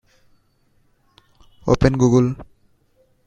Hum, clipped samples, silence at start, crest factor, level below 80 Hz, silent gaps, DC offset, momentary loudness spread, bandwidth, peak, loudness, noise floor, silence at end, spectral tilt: none; under 0.1%; 1.65 s; 22 dB; -38 dBFS; none; under 0.1%; 15 LU; 8 kHz; 0 dBFS; -18 LUFS; -61 dBFS; 0.8 s; -7.5 dB/octave